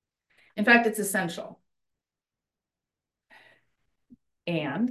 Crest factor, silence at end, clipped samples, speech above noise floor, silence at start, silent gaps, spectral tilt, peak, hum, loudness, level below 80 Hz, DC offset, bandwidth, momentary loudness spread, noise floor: 24 dB; 0 s; under 0.1%; over 65 dB; 0.55 s; none; -4 dB/octave; -6 dBFS; none; -25 LUFS; -78 dBFS; under 0.1%; 13 kHz; 20 LU; under -90 dBFS